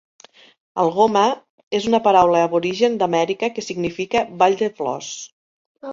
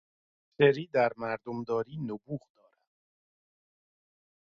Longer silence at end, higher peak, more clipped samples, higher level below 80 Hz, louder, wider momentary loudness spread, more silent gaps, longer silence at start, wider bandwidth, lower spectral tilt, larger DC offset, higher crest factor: second, 0 s vs 2.05 s; first, -2 dBFS vs -10 dBFS; neither; first, -58 dBFS vs -74 dBFS; first, -19 LUFS vs -30 LUFS; about the same, 16 LU vs 14 LU; first, 1.50-1.71 s, 5.32-5.75 s vs none; first, 0.75 s vs 0.6 s; first, 7.6 kHz vs 6.6 kHz; second, -4.5 dB/octave vs -7.5 dB/octave; neither; second, 18 dB vs 24 dB